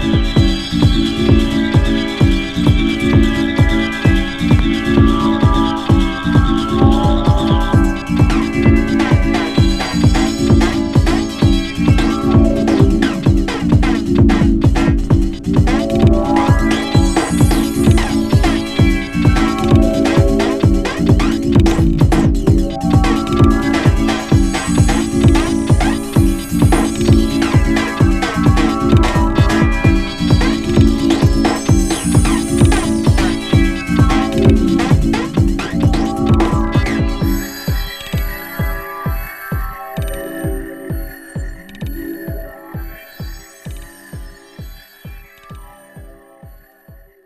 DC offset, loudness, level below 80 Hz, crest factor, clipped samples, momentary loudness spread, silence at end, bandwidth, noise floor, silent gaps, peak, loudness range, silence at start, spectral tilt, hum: under 0.1%; -14 LUFS; -20 dBFS; 14 dB; under 0.1%; 11 LU; 0.3 s; 14.5 kHz; -43 dBFS; none; 0 dBFS; 11 LU; 0 s; -6.5 dB/octave; none